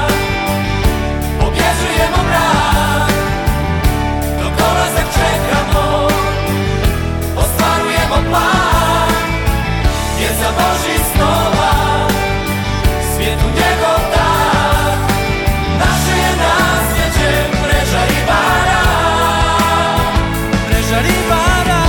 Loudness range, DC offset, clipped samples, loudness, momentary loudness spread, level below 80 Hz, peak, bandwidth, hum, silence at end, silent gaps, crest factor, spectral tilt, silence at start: 2 LU; under 0.1%; under 0.1%; -13 LUFS; 4 LU; -20 dBFS; 0 dBFS; 17.5 kHz; none; 0 s; none; 12 dB; -4.5 dB/octave; 0 s